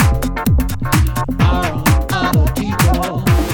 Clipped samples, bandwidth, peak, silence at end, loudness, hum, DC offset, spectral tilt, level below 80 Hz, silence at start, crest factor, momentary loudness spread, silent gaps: under 0.1%; 19 kHz; 0 dBFS; 0 s; -16 LUFS; none; under 0.1%; -5.5 dB/octave; -20 dBFS; 0 s; 14 dB; 2 LU; none